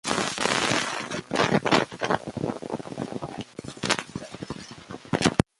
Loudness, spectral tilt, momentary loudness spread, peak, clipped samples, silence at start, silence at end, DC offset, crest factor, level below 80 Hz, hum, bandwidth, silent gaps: -26 LUFS; -4 dB/octave; 15 LU; -2 dBFS; under 0.1%; 0.05 s; 0.15 s; under 0.1%; 26 dB; -52 dBFS; none; 11.5 kHz; none